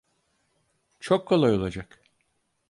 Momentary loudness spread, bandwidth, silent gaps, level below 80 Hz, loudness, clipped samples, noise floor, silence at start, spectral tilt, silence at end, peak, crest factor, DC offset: 19 LU; 11.5 kHz; none; -54 dBFS; -24 LUFS; under 0.1%; -73 dBFS; 1.05 s; -7 dB/octave; 0.85 s; -8 dBFS; 20 dB; under 0.1%